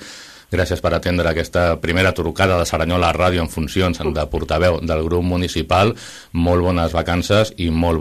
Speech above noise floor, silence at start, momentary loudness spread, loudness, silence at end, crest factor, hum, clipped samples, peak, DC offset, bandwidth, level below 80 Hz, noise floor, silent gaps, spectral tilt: 21 dB; 0 s; 5 LU; -18 LUFS; 0 s; 16 dB; none; under 0.1%; -2 dBFS; under 0.1%; 14 kHz; -32 dBFS; -38 dBFS; none; -5.5 dB/octave